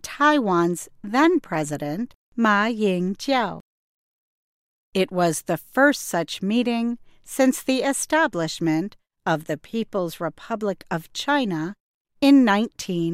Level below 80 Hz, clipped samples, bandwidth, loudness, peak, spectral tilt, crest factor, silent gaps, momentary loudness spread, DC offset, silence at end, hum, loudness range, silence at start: -60 dBFS; under 0.1%; 16 kHz; -22 LUFS; -6 dBFS; -4.5 dB/octave; 16 dB; 2.15-2.32 s, 3.60-4.92 s, 11.80-12.05 s; 11 LU; under 0.1%; 0 s; none; 4 LU; 0.05 s